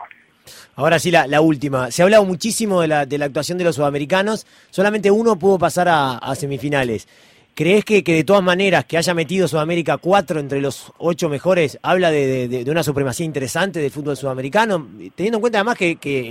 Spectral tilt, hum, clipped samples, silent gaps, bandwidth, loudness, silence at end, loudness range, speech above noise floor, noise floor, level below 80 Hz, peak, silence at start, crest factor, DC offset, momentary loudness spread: -5 dB/octave; none; under 0.1%; none; 16.5 kHz; -17 LUFS; 0 s; 3 LU; 28 dB; -45 dBFS; -54 dBFS; -2 dBFS; 0 s; 16 dB; under 0.1%; 9 LU